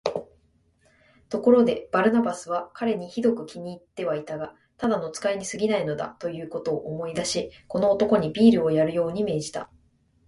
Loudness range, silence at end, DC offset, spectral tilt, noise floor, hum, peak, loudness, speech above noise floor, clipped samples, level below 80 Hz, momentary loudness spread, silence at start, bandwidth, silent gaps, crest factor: 5 LU; 0.6 s; under 0.1%; -5.5 dB/octave; -64 dBFS; none; -4 dBFS; -25 LUFS; 40 dB; under 0.1%; -60 dBFS; 15 LU; 0.05 s; 11.5 kHz; none; 20 dB